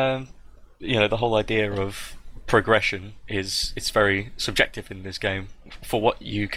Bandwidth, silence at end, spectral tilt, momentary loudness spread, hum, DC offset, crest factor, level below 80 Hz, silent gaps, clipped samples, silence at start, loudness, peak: 16 kHz; 0 s; -4 dB/octave; 16 LU; none; under 0.1%; 20 dB; -42 dBFS; none; under 0.1%; 0 s; -24 LUFS; -4 dBFS